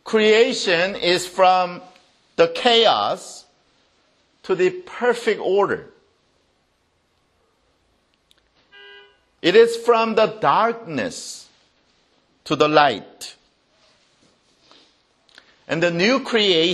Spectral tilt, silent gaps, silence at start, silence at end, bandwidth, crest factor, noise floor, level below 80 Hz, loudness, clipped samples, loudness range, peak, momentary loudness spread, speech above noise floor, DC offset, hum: -3.5 dB/octave; none; 0.05 s; 0 s; 12.5 kHz; 20 dB; -66 dBFS; -66 dBFS; -18 LUFS; under 0.1%; 7 LU; 0 dBFS; 19 LU; 47 dB; under 0.1%; none